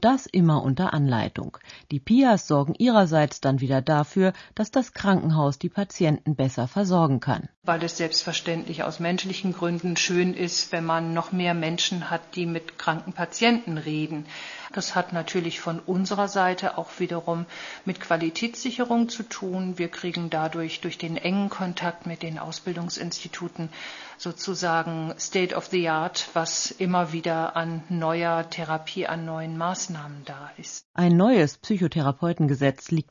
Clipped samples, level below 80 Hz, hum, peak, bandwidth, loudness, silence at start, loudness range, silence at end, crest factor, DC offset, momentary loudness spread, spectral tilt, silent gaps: under 0.1%; -62 dBFS; none; -4 dBFS; 7.4 kHz; -25 LUFS; 0 s; 7 LU; 0.1 s; 20 dB; under 0.1%; 11 LU; -5 dB/octave; 7.57-7.62 s, 30.85-30.94 s